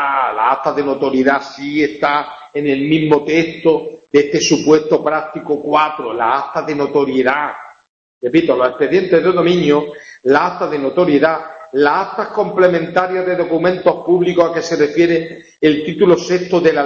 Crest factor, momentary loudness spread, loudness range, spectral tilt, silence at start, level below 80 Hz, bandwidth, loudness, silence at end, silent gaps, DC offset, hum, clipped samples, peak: 14 dB; 7 LU; 2 LU; -5.5 dB/octave; 0 s; -54 dBFS; 7.4 kHz; -15 LUFS; 0 s; 7.89-8.21 s; under 0.1%; none; under 0.1%; 0 dBFS